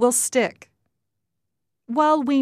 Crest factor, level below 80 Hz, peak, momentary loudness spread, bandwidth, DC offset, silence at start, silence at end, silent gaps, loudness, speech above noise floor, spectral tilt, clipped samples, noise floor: 16 dB; -74 dBFS; -8 dBFS; 9 LU; 15 kHz; under 0.1%; 0 s; 0 s; none; -21 LUFS; 63 dB; -2.5 dB/octave; under 0.1%; -82 dBFS